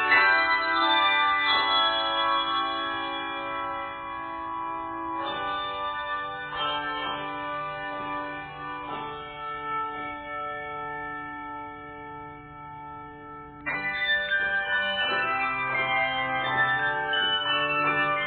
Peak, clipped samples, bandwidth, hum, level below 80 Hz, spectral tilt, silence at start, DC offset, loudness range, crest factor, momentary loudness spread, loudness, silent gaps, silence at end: -8 dBFS; under 0.1%; 4.7 kHz; none; -58 dBFS; -6.5 dB/octave; 0 s; under 0.1%; 11 LU; 20 dB; 16 LU; -26 LUFS; none; 0 s